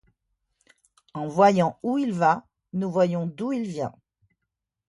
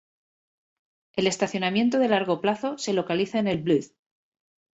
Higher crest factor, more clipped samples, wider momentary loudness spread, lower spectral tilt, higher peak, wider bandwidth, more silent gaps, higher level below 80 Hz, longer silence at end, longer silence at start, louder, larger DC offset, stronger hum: about the same, 22 dB vs 18 dB; neither; first, 15 LU vs 4 LU; first, -7 dB/octave vs -5 dB/octave; first, -4 dBFS vs -8 dBFS; first, 11.5 kHz vs 8.2 kHz; neither; about the same, -68 dBFS vs -64 dBFS; about the same, 0.95 s vs 0.9 s; about the same, 1.15 s vs 1.15 s; about the same, -24 LUFS vs -25 LUFS; neither; neither